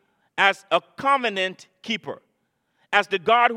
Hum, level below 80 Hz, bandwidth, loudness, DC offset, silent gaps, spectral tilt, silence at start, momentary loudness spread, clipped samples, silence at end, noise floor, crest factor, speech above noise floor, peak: none; -74 dBFS; 12.5 kHz; -22 LUFS; under 0.1%; none; -3 dB/octave; 0.35 s; 16 LU; under 0.1%; 0 s; -72 dBFS; 22 dB; 50 dB; -2 dBFS